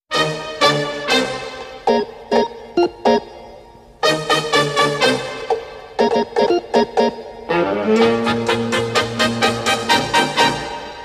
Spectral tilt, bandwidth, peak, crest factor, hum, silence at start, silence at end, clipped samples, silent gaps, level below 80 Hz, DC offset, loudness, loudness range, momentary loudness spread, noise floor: -3.5 dB/octave; 15.5 kHz; -2 dBFS; 16 dB; none; 0.1 s; 0 s; under 0.1%; none; -50 dBFS; under 0.1%; -17 LUFS; 3 LU; 8 LU; -42 dBFS